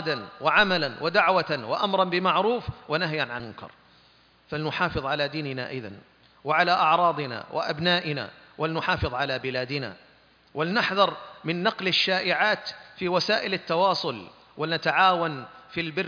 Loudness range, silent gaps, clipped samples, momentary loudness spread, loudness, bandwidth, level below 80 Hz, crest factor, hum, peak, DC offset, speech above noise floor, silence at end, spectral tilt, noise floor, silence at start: 5 LU; none; under 0.1%; 15 LU; -25 LUFS; 5.4 kHz; -54 dBFS; 20 dB; none; -6 dBFS; under 0.1%; 33 dB; 0 s; -5.5 dB/octave; -59 dBFS; 0 s